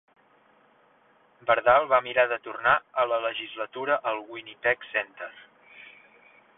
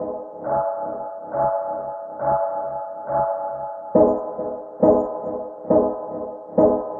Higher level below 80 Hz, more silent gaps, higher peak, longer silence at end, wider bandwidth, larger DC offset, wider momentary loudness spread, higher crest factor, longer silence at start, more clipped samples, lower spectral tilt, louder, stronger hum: second, -68 dBFS vs -52 dBFS; neither; about the same, -6 dBFS vs -4 dBFS; first, 0.75 s vs 0 s; first, 4 kHz vs 2.2 kHz; neither; first, 19 LU vs 13 LU; about the same, 20 dB vs 18 dB; first, 1.45 s vs 0 s; neither; second, -7 dB/octave vs -12.5 dB/octave; about the same, -25 LUFS vs -23 LUFS; neither